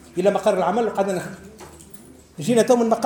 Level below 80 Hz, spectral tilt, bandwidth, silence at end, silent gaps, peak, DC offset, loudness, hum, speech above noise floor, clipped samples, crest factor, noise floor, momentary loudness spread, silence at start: -56 dBFS; -5.5 dB/octave; 19.5 kHz; 0 s; none; -4 dBFS; under 0.1%; -20 LUFS; none; 25 dB; under 0.1%; 16 dB; -45 dBFS; 24 LU; 0.15 s